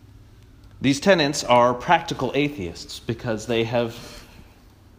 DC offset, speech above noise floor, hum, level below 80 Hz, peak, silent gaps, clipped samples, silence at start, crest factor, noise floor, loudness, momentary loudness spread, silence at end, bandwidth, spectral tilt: under 0.1%; 28 dB; none; -50 dBFS; -4 dBFS; none; under 0.1%; 0.8 s; 20 dB; -50 dBFS; -22 LUFS; 15 LU; 0.75 s; 15.5 kHz; -4.5 dB/octave